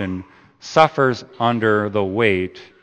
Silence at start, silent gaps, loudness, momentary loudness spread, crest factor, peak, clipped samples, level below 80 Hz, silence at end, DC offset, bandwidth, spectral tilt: 0 s; none; -18 LUFS; 13 LU; 20 dB; 0 dBFS; under 0.1%; -58 dBFS; 0.2 s; under 0.1%; 8.8 kHz; -6 dB/octave